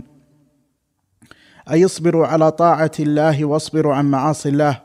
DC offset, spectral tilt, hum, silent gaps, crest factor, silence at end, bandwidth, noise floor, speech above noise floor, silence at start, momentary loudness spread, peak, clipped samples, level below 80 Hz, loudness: under 0.1%; -6.5 dB/octave; none; none; 16 dB; 0.05 s; 13 kHz; -68 dBFS; 53 dB; 1.65 s; 4 LU; -2 dBFS; under 0.1%; -60 dBFS; -16 LUFS